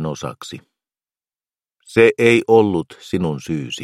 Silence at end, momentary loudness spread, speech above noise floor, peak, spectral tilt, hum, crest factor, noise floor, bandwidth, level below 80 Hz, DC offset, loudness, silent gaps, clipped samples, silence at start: 0 s; 17 LU; over 73 dB; 0 dBFS; -6 dB/octave; none; 18 dB; under -90 dBFS; 13 kHz; -54 dBFS; under 0.1%; -16 LUFS; none; under 0.1%; 0 s